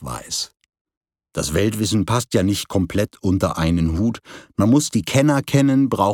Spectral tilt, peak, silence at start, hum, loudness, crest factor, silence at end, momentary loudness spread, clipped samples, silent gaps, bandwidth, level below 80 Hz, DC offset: -5.5 dB/octave; -2 dBFS; 0 s; none; -19 LUFS; 18 dB; 0 s; 9 LU; under 0.1%; 0.81-0.85 s, 0.97-1.01 s; 18.5 kHz; -40 dBFS; under 0.1%